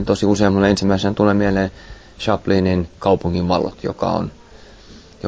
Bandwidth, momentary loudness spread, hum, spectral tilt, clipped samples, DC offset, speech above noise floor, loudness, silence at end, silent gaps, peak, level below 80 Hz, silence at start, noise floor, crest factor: 8 kHz; 8 LU; none; -6.5 dB/octave; under 0.1%; under 0.1%; 25 dB; -18 LUFS; 0 s; none; -2 dBFS; -36 dBFS; 0 s; -42 dBFS; 16 dB